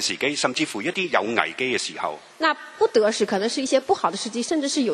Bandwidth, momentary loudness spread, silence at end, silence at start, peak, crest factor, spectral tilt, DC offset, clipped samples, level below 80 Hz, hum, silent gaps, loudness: 13 kHz; 5 LU; 0 s; 0 s; -2 dBFS; 22 dB; -2.5 dB/octave; under 0.1%; under 0.1%; -70 dBFS; none; none; -23 LUFS